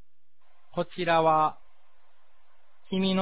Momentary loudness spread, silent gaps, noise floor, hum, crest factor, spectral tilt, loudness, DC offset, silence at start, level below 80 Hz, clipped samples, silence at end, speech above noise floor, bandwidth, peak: 12 LU; none; -74 dBFS; none; 18 dB; -9.5 dB/octave; -27 LUFS; 0.8%; 0.75 s; -66 dBFS; under 0.1%; 0 s; 49 dB; 4 kHz; -12 dBFS